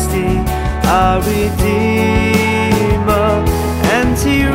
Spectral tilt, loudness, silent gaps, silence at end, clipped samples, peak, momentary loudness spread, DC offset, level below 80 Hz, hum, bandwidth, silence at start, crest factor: -5.5 dB/octave; -14 LUFS; none; 0 s; under 0.1%; 0 dBFS; 4 LU; under 0.1%; -22 dBFS; none; 16.5 kHz; 0 s; 12 dB